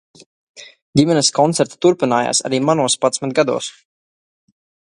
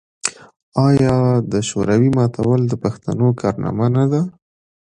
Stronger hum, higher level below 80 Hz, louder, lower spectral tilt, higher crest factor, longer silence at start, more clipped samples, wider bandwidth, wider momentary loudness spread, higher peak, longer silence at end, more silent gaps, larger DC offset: neither; second, -58 dBFS vs -46 dBFS; about the same, -16 LUFS vs -17 LUFS; second, -4 dB/octave vs -7 dB/octave; about the same, 18 dB vs 16 dB; first, 0.55 s vs 0.25 s; neither; about the same, 11.5 kHz vs 10.5 kHz; second, 6 LU vs 10 LU; about the same, 0 dBFS vs 0 dBFS; first, 1.25 s vs 0.55 s; about the same, 0.82-0.93 s vs 0.56-0.72 s; neither